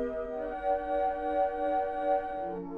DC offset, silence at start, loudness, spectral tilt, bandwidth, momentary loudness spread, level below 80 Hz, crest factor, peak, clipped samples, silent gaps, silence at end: under 0.1%; 0 s; -31 LUFS; -7.5 dB/octave; 4.8 kHz; 6 LU; -54 dBFS; 14 dB; -18 dBFS; under 0.1%; none; 0 s